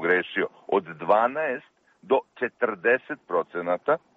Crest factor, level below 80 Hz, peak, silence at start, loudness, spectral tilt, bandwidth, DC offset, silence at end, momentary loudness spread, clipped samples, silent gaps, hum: 18 dB; -74 dBFS; -8 dBFS; 0 s; -26 LUFS; -2.5 dB/octave; 4.5 kHz; under 0.1%; 0.2 s; 7 LU; under 0.1%; none; none